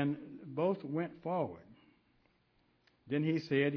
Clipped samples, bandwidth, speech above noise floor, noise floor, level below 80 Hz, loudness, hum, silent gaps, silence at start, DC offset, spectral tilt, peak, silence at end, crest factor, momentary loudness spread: under 0.1%; 5.4 kHz; 39 dB; -73 dBFS; -76 dBFS; -36 LUFS; none; none; 0 s; under 0.1%; -6 dB/octave; -18 dBFS; 0 s; 18 dB; 11 LU